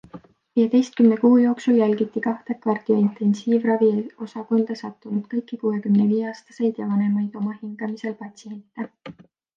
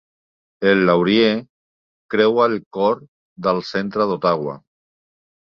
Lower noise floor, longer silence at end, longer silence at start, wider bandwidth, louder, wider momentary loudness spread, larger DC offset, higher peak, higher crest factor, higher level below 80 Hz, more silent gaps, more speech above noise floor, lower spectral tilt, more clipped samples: second, -45 dBFS vs under -90 dBFS; second, 0.45 s vs 0.85 s; second, 0.15 s vs 0.6 s; about the same, 7.4 kHz vs 6.8 kHz; second, -22 LUFS vs -18 LUFS; first, 16 LU vs 10 LU; neither; about the same, -4 dBFS vs -2 dBFS; about the same, 16 dB vs 18 dB; second, -72 dBFS vs -60 dBFS; second, none vs 1.50-2.09 s, 2.66-2.71 s, 3.08-3.36 s; second, 24 dB vs over 72 dB; about the same, -8 dB/octave vs -7 dB/octave; neither